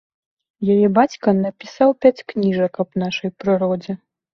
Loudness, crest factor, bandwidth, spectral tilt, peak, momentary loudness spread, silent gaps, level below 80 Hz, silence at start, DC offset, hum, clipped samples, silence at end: -19 LUFS; 18 dB; 6.8 kHz; -7.5 dB/octave; -2 dBFS; 11 LU; none; -60 dBFS; 0.6 s; under 0.1%; none; under 0.1%; 0.4 s